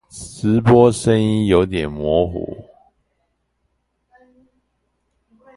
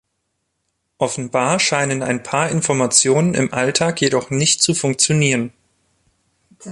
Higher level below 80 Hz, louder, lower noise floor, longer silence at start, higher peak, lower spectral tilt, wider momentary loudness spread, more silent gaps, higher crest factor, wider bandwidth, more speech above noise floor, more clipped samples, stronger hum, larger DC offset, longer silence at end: first, -40 dBFS vs -56 dBFS; about the same, -16 LUFS vs -17 LUFS; about the same, -69 dBFS vs -72 dBFS; second, 0.15 s vs 1 s; about the same, 0 dBFS vs 0 dBFS; first, -7 dB/octave vs -3.5 dB/octave; first, 18 LU vs 8 LU; neither; about the same, 20 dB vs 18 dB; about the same, 11.5 kHz vs 11.5 kHz; about the same, 54 dB vs 55 dB; neither; neither; neither; first, 2.95 s vs 0 s